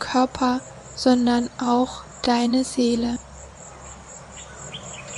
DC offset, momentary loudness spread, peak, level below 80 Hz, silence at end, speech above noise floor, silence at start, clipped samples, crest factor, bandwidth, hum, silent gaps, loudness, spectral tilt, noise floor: under 0.1%; 20 LU; -4 dBFS; -48 dBFS; 0 s; 20 dB; 0 s; under 0.1%; 18 dB; 11.5 kHz; none; none; -22 LUFS; -4 dB/octave; -41 dBFS